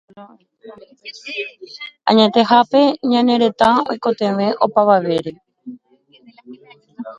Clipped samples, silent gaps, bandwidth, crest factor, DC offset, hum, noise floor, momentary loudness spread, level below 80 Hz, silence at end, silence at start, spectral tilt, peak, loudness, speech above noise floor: under 0.1%; none; 10.5 kHz; 18 dB; under 0.1%; none; -53 dBFS; 22 LU; -60 dBFS; 0.05 s; 0.15 s; -6 dB/octave; 0 dBFS; -15 LUFS; 37 dB